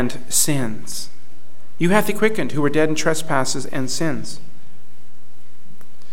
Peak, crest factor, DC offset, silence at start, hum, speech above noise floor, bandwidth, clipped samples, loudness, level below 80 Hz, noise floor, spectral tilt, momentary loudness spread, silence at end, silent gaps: -2 dBFS; 22 dB; 10%; 0 s; none; 32 dB; 18 kHz; under 0.1%; -21 LUFS; -58 dBFS; -53 dBFS; -4 dB/octave; 13 LU; 1.75 s; none